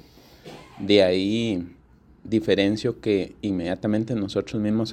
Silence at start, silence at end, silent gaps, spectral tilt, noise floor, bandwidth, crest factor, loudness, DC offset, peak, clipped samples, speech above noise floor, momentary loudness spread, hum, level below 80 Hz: 0.45 s; 0 s; none; -6.5 dB/octave; -50 dBFS; 10 kHz; 20 dB; -23 LUFS; under 0.1%; -4 dBFS; under 0.1%; 27 dB; 16 LU; none; -54 dBFS